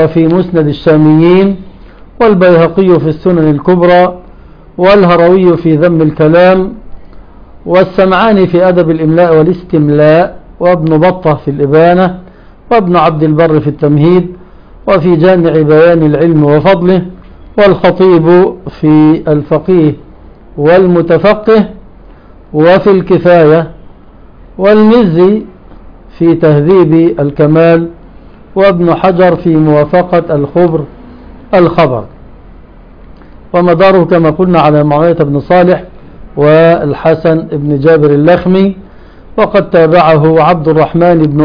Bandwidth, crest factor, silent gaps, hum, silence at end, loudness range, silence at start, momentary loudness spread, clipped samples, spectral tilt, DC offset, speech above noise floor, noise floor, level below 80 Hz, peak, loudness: 5.4 kHz; 8 dB; none; none; 0 s; 2 LU; 0 s; 7 LU; 2%; -10 dB/octave; under 0.1%; 28 dB; -34 dBFS; -34 dBFS; 0 dBFS; -7 LUFS